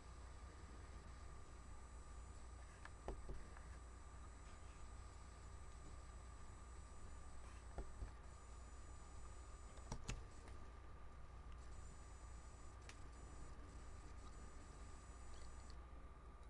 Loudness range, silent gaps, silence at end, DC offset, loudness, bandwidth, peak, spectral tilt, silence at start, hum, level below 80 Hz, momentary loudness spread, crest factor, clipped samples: 2 LU; none; 0 s; under 0.1%; -59 LUFS; 11 kHz; -32 dBFS; -4.5 dB/octave; 0 s; none; -58 dBFS; 4 LU; 22 dB; under 0.1%